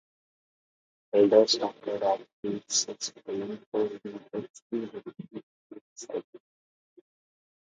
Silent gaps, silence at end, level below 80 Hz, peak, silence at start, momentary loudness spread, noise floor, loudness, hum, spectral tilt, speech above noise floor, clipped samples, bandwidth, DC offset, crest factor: 2.33-2.43 s, 3.66-3.72 s, 4.50-4.54 s, 4.62-4.70 s, 5.43-5.70 s, 5.81-5.96 s, 6.24-6.33 s; 1.3 s; -78 dBFS; -8 dBFS; 1.15 s; 21 LU; under -90 dBFS; -29 LUFS; none; -3 dB/octave; over 61 dB; under 0.1%; 9.6 kHz; under 0.1%; 24 dB